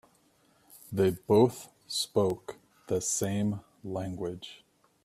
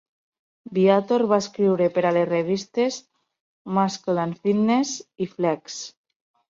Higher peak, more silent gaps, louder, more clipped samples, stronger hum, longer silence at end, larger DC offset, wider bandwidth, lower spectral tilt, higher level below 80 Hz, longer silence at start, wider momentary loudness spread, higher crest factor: second, -10 dBFS vs -6 dBFS; second, none vs 3.40-3.65 s; second, -30 LUFS vs -22 LUFS; neither; neither; about the same, 0.5 s vs 0.6 s; neither; first, 15.5 kHz vs 7.8 kHz; about the same, -5 dB/octave vs -5.5 dB/octave; about the same, -64 dBFS vs -68 dBFS; about the same, 0.75 s vs 0.7 s; first, 17 LU vs 10 LU; about the same, 22 dB vs 18 dB